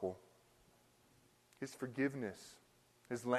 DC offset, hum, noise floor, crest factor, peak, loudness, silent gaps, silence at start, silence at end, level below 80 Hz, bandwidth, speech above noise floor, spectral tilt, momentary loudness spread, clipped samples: under 0.1%; none; -71 dBFS; 24 dB; -20 dBFS; -44 LUFS; none; 0 s; 0 s; -82 dBFS; 13 kHz; 30 dB; -5.5 dB/octave; 18 LU; under 0.1%